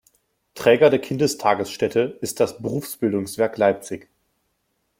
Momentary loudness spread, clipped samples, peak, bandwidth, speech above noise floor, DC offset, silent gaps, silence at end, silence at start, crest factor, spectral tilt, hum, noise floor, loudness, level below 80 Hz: 12 LU; under 0.1%; -2 dBFS; 16.5 kHz; 51 dB; under 0.1%; none; 1 s; 0.55 s; 20 dB; -5 dB/octave; none; -72 dBFS; -21 LUFS; -62 dBFS